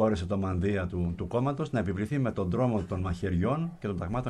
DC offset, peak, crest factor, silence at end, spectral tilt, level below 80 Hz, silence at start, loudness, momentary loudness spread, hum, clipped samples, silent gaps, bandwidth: under 0.1%; -14 dBFS; 14 dB; 0 s; -8.5 dB/octave; -46 dBFS; 0 s; -30 LUFS; 4 LU; none; under 0.1%; none; 11 kHz